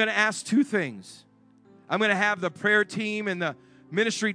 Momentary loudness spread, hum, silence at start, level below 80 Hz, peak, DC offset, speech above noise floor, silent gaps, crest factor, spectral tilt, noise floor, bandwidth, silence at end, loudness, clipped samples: 9 LU; none; 0 s; -78 dBFS; -8 dBFS; under 0.1%; 31 dB; none; 20 dB; -4 dB/octave; -56 dBFS; 10.5 kHz; 0 s; -25 LUFS; under 0.1%